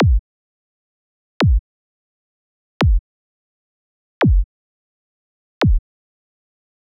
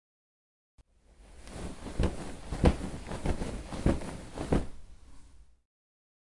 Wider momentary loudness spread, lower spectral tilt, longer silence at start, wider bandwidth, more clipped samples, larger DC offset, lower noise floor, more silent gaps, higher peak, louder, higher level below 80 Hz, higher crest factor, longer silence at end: second, 6 LU vs 15 LU; about the same, -7.5 dB/octave vs -6.5 dB/octave; second, 0 s vs 0.8 s; second, 1.6 kHz vs 11.5 kHz; neither; neither; first, under -90 dBFS vs -58 dBFS; first, 0.19-1.40 s, 1.59-2.80 s, 2.99-4.21 s, 4.44-5.61 s vs none; about the same, -8 dBFS vs -10 dBFS; first, -19 LUFS vs -34 LUFS; first, -24 dBFS vs -40 dBFS; second, 12 dB vs 24 dB; first, 1.2 s vs 0.95 s